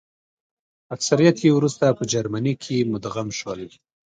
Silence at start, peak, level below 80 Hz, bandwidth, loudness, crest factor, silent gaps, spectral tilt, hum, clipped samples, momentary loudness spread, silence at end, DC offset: 0.9 s; -2 dBFS; -60 dBFS; 9.4 kHz; -21 LUFS; 20 dB; none; -5.5 dB/octave; none; under 0.1%; 16 LU; 0.45 s; under 0.1%